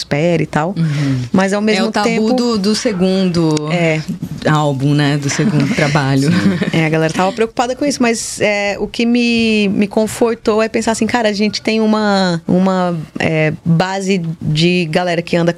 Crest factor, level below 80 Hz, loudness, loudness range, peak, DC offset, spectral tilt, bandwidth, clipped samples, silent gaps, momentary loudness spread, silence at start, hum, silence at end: 12 dB; -46 dBFS; -14 LUFS; 1 LU; -2 dBFS; under 0.1%; -5.5 dB/octave; 13.5 kHz; under 0.1%; none; 4 LU; 0 s; none; 0 s